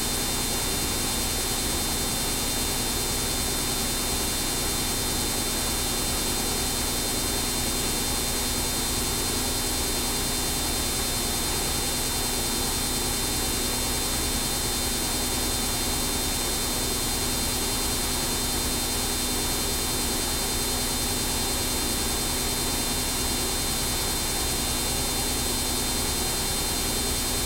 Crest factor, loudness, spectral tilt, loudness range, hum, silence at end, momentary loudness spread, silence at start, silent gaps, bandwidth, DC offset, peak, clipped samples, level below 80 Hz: 14 dB; -25 LUFS; -2 dB/octave; 0 LU; none; 0 s; 0 LU; 0 s; none; 16.5 kHz; under 0.1%; -12 dBFS; under 0.1%; -34 dBFS